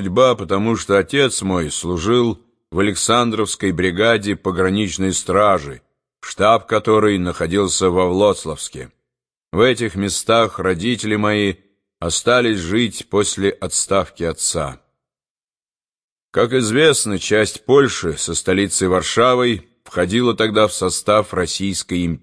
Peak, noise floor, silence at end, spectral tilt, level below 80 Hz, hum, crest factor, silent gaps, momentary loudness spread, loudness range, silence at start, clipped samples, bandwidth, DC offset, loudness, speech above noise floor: -2 dBFS; under -90 dBFS; 0.05 s; -4 dB/octave; -44 dBFS; none; 16 dB; 15.30-15.36 s, 15.62-15.66 s, 16.03-16.16 s, 16.22-16.33 s; 7 LU; 3 LU; 0 s; under 0.1%; 11 kHz; under 0.1%; -17 LUFS; over 73 dB